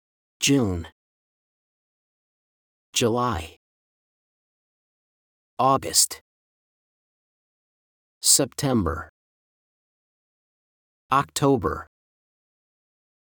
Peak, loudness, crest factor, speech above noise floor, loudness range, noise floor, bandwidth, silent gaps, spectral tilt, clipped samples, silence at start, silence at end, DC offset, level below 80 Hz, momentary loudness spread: -2 dBFS; -22 LUFS; 26 dB; over 68 dB; 7 LU; under -90 dBFS; over 20 kHz; 0.92-2.93 s, 3.56-5.57 s, 6.21-8.21 s, 9.09-11.09 s; -3.5 dB/octave; under 0.1%; 0.4 s; 1.35 s; under 0.1%; -54 dBFS; 15 LU